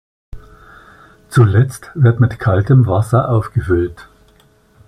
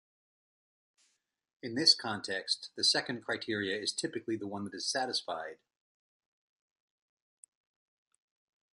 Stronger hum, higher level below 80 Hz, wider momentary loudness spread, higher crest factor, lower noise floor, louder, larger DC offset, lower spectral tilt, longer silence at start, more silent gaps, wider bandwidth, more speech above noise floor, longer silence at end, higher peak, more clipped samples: neither; first, -40 dBFS vs -78 dBFS; second, 6 LU vs 15 LU; second, 14 dB vs 26 dB; second, -51 dBFS vs -78 dBFS; first, -14 LUFS vs -32 LUFS; neither; first, -8.5 dB/octave vs -2 dB/octave; second, 0.35 s vs 1.65 s; neither; first, 12.5 kHz vs 11 kHz; second, 38 dB vs 44 dB; second, 0.85 s vs 3.2 s; first, -2 dBFS vs -12 dBFS; neither